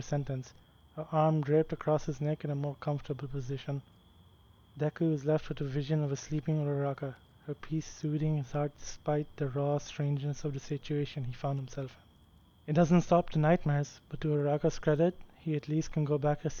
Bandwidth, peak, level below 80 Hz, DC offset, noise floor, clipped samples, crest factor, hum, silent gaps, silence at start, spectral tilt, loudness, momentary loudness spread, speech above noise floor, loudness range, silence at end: 7 kHz; -14 dBFS; -52 dBFS; under 0.1%; -61 dBFS; under 0.1%; 18 dB; none; none; 0 s; -7.5 dB/octave; -33 LUFS; 12 LU; 30 dB; 6 LU; 0 s